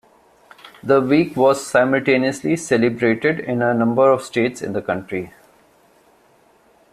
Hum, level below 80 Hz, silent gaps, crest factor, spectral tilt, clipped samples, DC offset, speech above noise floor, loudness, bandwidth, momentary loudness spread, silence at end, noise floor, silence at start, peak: none; -58 dBFS; none; 16 dB; -5.5 dB/octave; under 0.1%; under 0.1%; 37 dB; -18 LUFS; 14 kHz; 10 LU; 1.65 s; -55 dBFS; 0.65 s; -2 dBFS